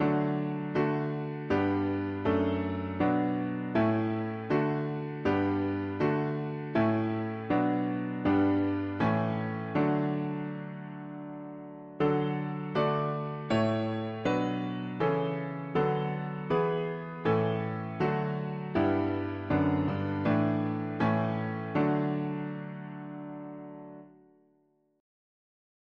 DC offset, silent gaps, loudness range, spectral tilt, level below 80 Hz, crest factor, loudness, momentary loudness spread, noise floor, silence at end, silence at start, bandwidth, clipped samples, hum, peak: under 0.1%; none; 4 LU; -9 dB/octave; -62 dBFS; 16 dB; -30 LUFS; 12 LU; -70 dBFS; 1.9 s; 0 s; 7.8 kHz; under 0.1%; none; -14 dBFS